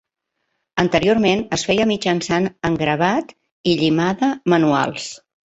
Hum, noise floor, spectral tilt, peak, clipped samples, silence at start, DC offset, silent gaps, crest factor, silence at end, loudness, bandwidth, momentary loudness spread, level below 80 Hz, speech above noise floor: none; -75 dBFS; -5 dB/octave; -2 dBFS; under 0.1%; 0.75 s; under 0.1%; 3.51-3.64 s; 16 dB; 0.3 s; -18 LUFS; 8.2 kHz; 8 LU; -50 dBFS; 57 dB